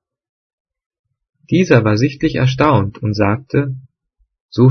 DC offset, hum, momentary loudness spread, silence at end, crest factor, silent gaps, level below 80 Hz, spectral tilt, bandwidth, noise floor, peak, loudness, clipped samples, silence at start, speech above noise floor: under 0.1%; none; 9 LU; 0 s; 16 dB; 4.40-4.49 s; -44 dBFS; -7.5 dB/octave; 6.6 kHz; -64 dBFS; 0 dBFS; -15 LUFS; under 0.1%; 1.5 s; 49 dB